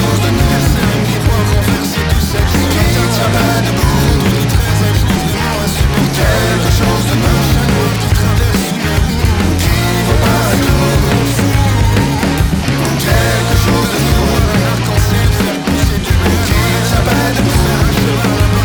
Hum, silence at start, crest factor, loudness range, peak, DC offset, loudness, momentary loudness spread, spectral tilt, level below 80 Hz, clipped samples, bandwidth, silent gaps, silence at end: none; 0 s; 12 dB; 0 LU; 0 dBFS; under 0.1%; -12 LUFS; 2 LU; -5 dB/octave; -18 dBFS; under 0.1%; over 20 kHz; none; 0 s